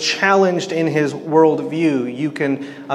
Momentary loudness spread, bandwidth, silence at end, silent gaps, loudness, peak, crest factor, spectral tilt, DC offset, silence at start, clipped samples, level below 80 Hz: 8 LU; 12 kHz; 0 s; none; -17 LUFS; -2 dBFS; 16 dB; -5 dB/octave; under 0.1%; 0 s; under 0.1%; -74 dBFS